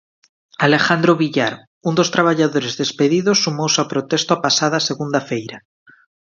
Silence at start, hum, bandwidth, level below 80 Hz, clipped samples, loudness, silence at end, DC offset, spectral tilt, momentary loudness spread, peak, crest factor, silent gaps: 0.6 s; none; 7.6 kHz; -62 dBFS; under 0.1%; -17 LUFS; 0.8 s; under 0.1%; -4 dB/octave; 8 LU; 0 dBFS; 18 dB; 1.67-1.81 s